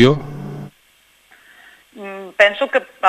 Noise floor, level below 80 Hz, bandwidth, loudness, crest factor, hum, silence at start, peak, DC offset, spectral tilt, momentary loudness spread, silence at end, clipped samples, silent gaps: -55 dBFS; -54 dBFS; 14.5 kHz; -17 LUFS; 18 dB; none; 0 s; 0 dBFS; under 0.1%; -6 dB/octave; 21 LU; 0 s; under 0.1%; none